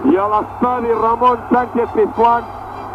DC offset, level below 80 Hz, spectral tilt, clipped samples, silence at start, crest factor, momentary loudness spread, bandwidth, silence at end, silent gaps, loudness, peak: under 0.1%; -42 dBFS; -8 dB/octave; under 0.1%; 0 s; 12 dB; 5 LU; 8.4 kHz; 0 s; none; -15 LUFS; -4 dBFS